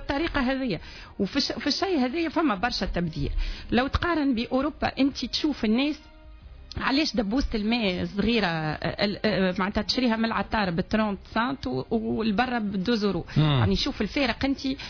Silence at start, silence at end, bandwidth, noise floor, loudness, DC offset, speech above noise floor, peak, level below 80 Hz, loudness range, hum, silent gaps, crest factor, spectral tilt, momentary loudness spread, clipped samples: 0 s; 0 s; 5.4 kHz; -46 dBFS; -26 LUFS; under 0.1%; 20 dB; -10 dBFS; -40 dBFS; 1 LU; none; none; 16 dB; -6 dB/octave; 5 LU; under 0.1%